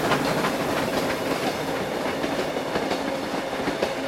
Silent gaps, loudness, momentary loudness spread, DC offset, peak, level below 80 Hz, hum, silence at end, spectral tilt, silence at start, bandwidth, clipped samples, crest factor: none; -26 LUFS; 4 LU; under 0.1%; -8 dBFS; -52 dBFS; none; 0 s; -4.5 dB/octave; 0 s; 16.5 kHz; under 0.1%; 16 dB